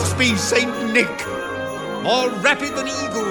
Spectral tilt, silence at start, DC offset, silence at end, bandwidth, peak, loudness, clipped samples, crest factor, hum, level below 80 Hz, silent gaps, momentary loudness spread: -3.5 dB/octave; 0 s; under 0.1%; 0 s; 19 kHz; -2 dBFS; -19 LUFS; under 0.1%; 18 dB; none; -50 dBFS; none; 9 LU